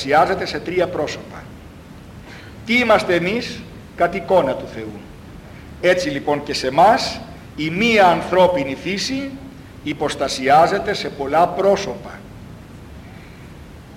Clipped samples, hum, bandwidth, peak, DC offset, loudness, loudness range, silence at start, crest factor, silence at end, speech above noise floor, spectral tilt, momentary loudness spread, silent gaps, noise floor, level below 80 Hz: under 0.1%; none; 16 kHz; -4 dBFS; under 0.1%; -18 LUFS; 4 LU; 0 s; 16 dB; 0 s; 21 dB; -4.5 dB/octave; 25 LU; none; -39 dBFS; -44 dBFS